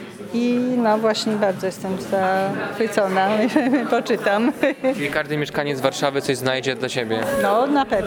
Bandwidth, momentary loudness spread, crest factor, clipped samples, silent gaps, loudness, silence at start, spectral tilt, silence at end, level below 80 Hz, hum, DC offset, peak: 19.5 kHz; 5 LU; 18 dB; under 0.1%; none; -21 LUFS; 0 s; -5 dB/octave; 0 s; -56 dBFS; none; under 0.1%; -2 dBFS